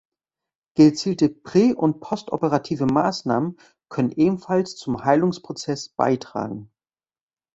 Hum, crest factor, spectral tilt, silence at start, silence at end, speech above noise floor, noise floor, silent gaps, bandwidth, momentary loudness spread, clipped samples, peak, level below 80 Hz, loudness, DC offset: none; 18 dB; -6.5 dB/octave; 0.75 s; 0.9 s; over 69 dB; under -90 dBFS; none; 8 kHz; 13 LU; under 0.1%; -4 dBFS; -60 dBFS; -22 LUFS; under 0.1%